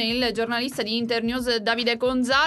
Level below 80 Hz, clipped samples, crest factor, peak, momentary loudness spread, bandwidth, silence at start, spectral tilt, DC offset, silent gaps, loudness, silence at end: -50 dBFS; under 0.1%; 16 dB; -8 dBFS; 3 LU; 12 kHz; 0 s; -3.5 dB/octave; under 0.1%; none; -24 LUFS; 0 s